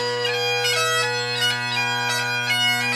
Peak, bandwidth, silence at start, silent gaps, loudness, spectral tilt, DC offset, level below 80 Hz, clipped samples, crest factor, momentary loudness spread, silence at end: -8 dBFS; 15.5 kHz; 0 s; none; -20 LUFS; -1.5 dB/octave; under 0.1%; -72 dBFS; under 0.1%; 14 dB; 3 LU; 0 s